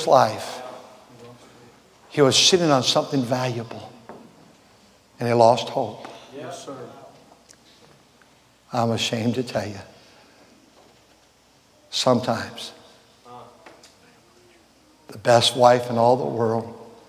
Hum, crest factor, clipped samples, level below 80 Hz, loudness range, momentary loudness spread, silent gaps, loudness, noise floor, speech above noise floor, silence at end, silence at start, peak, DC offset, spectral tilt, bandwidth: none; 24 dB; under 0.1%; -62 dBFS; 8 LU; 23 LU; none; -20 LUFS; -57 dBFS; 37 dB; 0.2 s; 0 s; 0 dBFS; under 0.1%; -4 dB/octave; 16 kHz